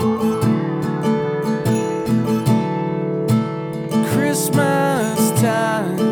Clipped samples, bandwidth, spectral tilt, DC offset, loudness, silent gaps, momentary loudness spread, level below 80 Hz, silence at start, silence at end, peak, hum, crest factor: under 0.1%; over 20 kHz; -6 dB/octave; under 0.1%; -19 LUFS; none; 5 LU; -54 dBFS; 0 s; 0 s; -4 dBFS; none; 14 dB